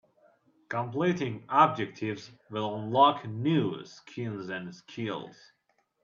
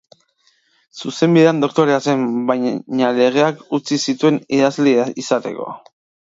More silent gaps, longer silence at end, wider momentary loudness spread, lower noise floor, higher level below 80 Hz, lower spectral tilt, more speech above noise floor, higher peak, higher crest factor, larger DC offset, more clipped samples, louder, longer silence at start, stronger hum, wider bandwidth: neither; first, 0.7 s vs 0.45 s; first, 17 LU vs 13 LU; first, -65 dBFS vs -60 dBFS; second, -76 dBFS vs -66 dBFS; about the same, -6.5 dB/octave vs -5.5 dB/octave; second, 36 dB vs 44 dB; second, -8 dBFS vs 0 dBFS; first, 24 dB vs 16 dB; neither; neither; second, -29 LUFS vs -16 LUFS; second, 0.7 s vs 0.95 s; neither; about the same, 7.4 kHz vs 7.8 kHz